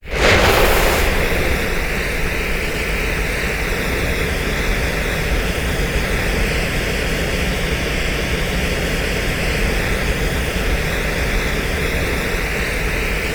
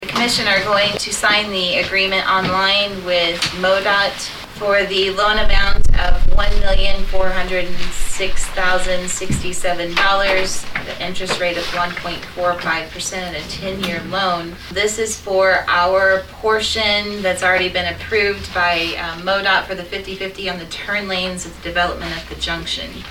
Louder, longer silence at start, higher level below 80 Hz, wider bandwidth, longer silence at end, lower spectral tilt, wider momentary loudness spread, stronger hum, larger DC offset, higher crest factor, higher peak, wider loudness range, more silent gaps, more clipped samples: about the same, -19 LUFS vs -18 LUFS; about the same, 0.05 s vs 0 s; about the same, -22 dBFS vs -24 dBFS; first, over 20 kHz vs 14 kHz; about the same, 0 s vs 0 s; about the same, -4 dB/octave vs -3 dB/octave; second, 5 LU vs 10 LU; neither; neither; about the same, 16 dB vs 14 dB; about the same, -2 dBFS vs -2 dBFS; second, 2 LU vs 5 LU; neither; neither